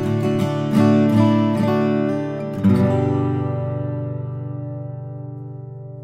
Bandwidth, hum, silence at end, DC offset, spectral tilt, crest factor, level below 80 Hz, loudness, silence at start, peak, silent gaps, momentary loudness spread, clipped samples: 14.5 kHz; none; 0 s; under 0.1%; -8.5 dB/octave; 16 dB; -56 dBFS; -19 LUFS; 0 s; -4 dBFS; none; 17 LU; under 0.1%